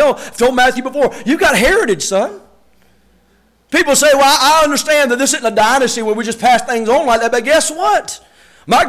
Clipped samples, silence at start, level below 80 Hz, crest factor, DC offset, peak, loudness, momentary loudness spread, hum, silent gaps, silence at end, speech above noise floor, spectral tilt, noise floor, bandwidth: under 0.1%; 0 s; -40 dBFS; 10 dB; under 0.1%; -2 dBFS; -12 LUFS; 8 LU; none; none; 0 s; 42 dB; -2 dB/octave; -54 dBFS; 16 kHz